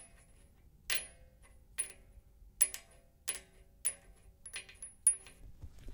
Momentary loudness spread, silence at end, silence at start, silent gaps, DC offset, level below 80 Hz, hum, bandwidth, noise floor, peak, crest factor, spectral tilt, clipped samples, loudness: 24 LU; 0 s; 0 s; none; under 0.1%; -60 dBFS; none; 18 kHz; -62 dBFS; -12 dBFS; 28 dB; 1 dB/octave; under 0.1%; -35 LUFS